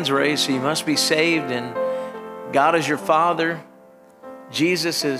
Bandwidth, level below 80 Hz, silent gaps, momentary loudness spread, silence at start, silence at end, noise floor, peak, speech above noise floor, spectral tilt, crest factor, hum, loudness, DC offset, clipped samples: 16 kHz; -72 dBFS; none; 12 LU; 0 s; 0 s; -48 dBFS; -4 dBFS; 28 dB; -3.5 dB/octave; 18 dB; none; -20 LUFS; under 0.1%; under 0.1%